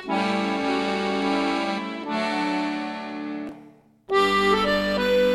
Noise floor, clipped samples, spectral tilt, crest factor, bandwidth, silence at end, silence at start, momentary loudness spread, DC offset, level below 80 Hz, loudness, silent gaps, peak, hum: -50 dBFS; under 0.1%; -5 dB/octave; 16 dB; 16.5 kHz; 0 s; 0 s; 12 LU; under 0.1%; -52 dBFS; -24 LUFS; none; -8 dBFS; none